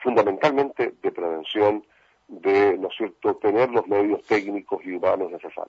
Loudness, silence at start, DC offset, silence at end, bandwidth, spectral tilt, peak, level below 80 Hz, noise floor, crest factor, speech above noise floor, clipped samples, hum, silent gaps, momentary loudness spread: -23 LUFS; 0 s; under 0.1%; 0.05 s; 7.4 kHz; -6.5 dB/octave; -6 dBFS; -68 dBFS; -46 dBFS; 18 dB; 23 dB; under 0.1%; none; none; 10 LU